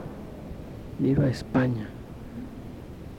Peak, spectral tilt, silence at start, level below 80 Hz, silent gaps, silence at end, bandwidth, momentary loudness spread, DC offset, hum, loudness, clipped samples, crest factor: -10 dBFS; -8.5 dB/octave; 0 s; -46 dBFS; none; 0 s; 16 kHz; 17 LU; under 0.1%; none; -27 LUFS; under 0.1%; 18 dB